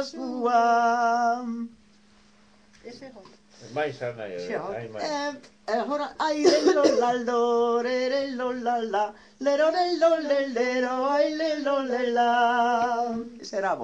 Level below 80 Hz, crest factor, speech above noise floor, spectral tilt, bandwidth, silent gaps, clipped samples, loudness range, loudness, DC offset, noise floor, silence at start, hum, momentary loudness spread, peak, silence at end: -70 dBFS; 18 dB; 33 dB; -4 dB/octave; 9.6 kHz; none; under 0.1%; 10 LU; -25 LUFS; under 0.1%; -58 dBFS; 0 s; none; 13 LU; -8 dBFS; 0 s